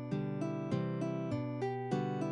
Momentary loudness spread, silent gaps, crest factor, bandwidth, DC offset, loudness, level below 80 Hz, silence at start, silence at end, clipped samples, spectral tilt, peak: 2 LU; none; 14 dB; 10 kHz; under 0.1%; -37 LUFS; -70 dBFS; 0 s; 0 s; under 0.1%; -8.5 dB/octave; -22 dBFS